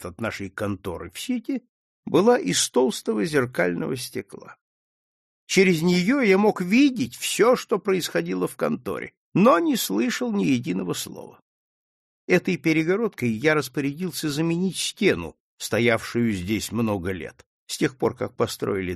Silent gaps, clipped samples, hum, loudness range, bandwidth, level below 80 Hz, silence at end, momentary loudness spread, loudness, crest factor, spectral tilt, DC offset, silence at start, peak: 1.69-2.03 s, 4.61-5.47 s, 9.17-9.32 s, 11.42-12.28 s, 15.40-15.58 s, 17.46-17.67 s; under 0.1%; none; 4 LU; 13 kHz; -58 dBFS; 0 s; 13 LU; -23 LUFS; 20 dB; -5 dB/octave; under 0.1%; 0 s; -4 dBFS